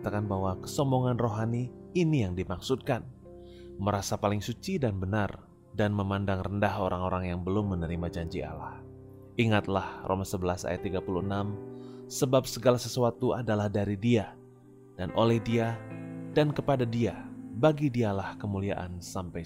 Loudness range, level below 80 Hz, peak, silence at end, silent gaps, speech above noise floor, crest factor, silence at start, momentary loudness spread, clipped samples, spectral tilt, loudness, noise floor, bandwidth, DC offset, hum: 3 LU; -54 dBFS; -10 dBFS; 0 s; none; 24 dB; 20 dB; 0 s; 14 LU; under 0.1%; -6.5 dB/octave; -30 LUFS; -53 dBFS; 16 kHz; under 0.1%; none